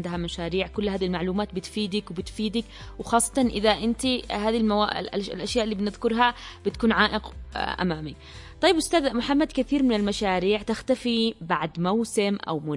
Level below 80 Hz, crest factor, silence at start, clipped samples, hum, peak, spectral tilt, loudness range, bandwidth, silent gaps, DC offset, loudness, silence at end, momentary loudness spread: -44 dBFS; 20 dB; 0 s; under 0.1%; none; -6 dBFS; -4.5 dB/octave; 2 LU; 11.5 kHz; none; under 0.1%; -25 LUFS; 0 s; 9 LU